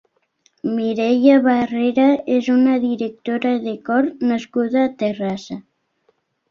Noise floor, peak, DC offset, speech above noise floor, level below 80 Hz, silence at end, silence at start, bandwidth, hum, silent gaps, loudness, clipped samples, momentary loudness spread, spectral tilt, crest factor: -64 dBFS; -2 dBFS; under 0.1%; 47 dB; -62 dBFS; 0.9 s; 0.65 s; 7 kHz; none; none; -18 LUFS; under 0.1%; 11 LU; -6.5 dB/octave; 16 dB